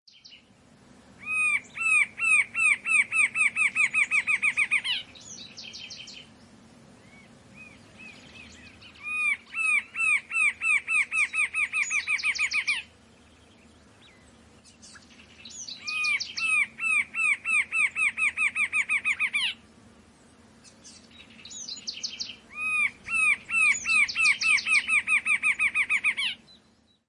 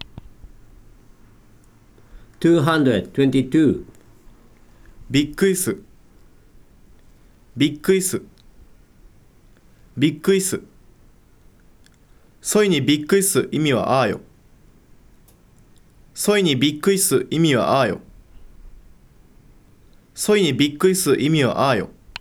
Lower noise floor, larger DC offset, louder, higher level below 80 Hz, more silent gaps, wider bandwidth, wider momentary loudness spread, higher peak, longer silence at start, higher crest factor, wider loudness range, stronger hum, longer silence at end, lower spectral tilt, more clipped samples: first, -63 dBFS vs -51 dBFS; neither; second, -23 LUFS vs -19 LUFS; second, -68 dBFS vs -50 dBFS; neither; second, 11.5 kHz vs over 20 kHz; first, 18 LU vs 13 LU; second, -10 dBFS vs -4 dBFS; first, 0.3 s vs 0 s; about the same, 18 dB vs 18 dB; first, 12 LU vs 6 LU; neither; first, 0.7 s vs 0.1 s; second, 1 dB/octave vs -4.5 dB/octave; neither